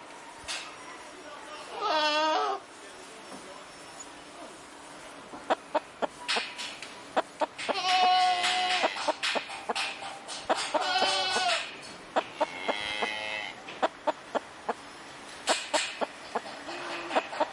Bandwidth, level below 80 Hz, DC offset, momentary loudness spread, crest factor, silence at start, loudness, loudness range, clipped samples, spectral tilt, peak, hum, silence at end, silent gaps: 11.5 kHz; -72 dBFS; under 0.1%; 19 LU; 20 dB; 0 s; -30 LUFS; 8 LU; under 0.1%; -1 dB/octave; -12 dBFS; none; 0 s; none